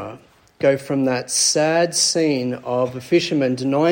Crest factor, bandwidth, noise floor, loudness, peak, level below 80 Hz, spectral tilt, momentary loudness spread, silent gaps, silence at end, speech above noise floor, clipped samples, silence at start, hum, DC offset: 16 dB; 17 kHz; -43 dBFS; -19 LUFS; -4 dBFS; -62 dBFS; -3.5 dB/octave; 7 LU; none; 0 s; 25 dB; under 0.1%; 0 s; none; under 0.1%